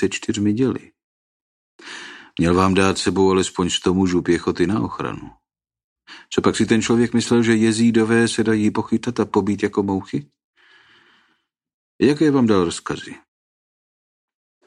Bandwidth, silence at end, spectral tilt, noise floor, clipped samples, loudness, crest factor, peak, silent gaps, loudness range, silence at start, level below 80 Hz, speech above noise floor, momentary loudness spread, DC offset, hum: 11 kHz; 1.5 s; -5.5 dB/octave; -67 dBFS; under 0.1%; -19 LUFS; 18 dB; -2 dBFS; 1.04-1.79 s, 5.84-5.96 s, 10.44-10.53 s, 11.74-11.99 s; 5 LU; 0 s; -50 dBFS; 49 dB; 13 LU; under 0.1%; none